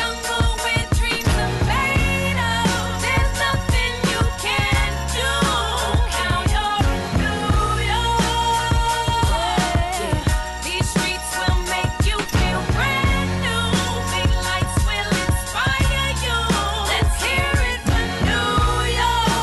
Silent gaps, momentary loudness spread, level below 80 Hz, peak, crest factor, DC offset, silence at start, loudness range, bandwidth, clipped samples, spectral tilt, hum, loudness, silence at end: none; 3 LU; -24 dBFS; -10 dBFS; 10 dB; under 0.1%; 0 s; 1 LU; 12.5 kHz; under 0.1%; -4 dB/octave; none; -20 LUFS; 0 s